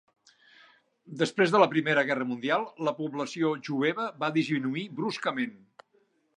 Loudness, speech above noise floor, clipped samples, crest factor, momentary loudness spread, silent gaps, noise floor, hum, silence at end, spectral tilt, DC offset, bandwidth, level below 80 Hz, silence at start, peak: -28 LUFS; 41 dB; under 0.1%; 22 dB; 10 LU; none; -69 dBFS; none; 0.8 s; -5.5 dB/octave; under 0.1%; 10.5 kHz; -82 dBFS; 1.05 s; -6 dBFS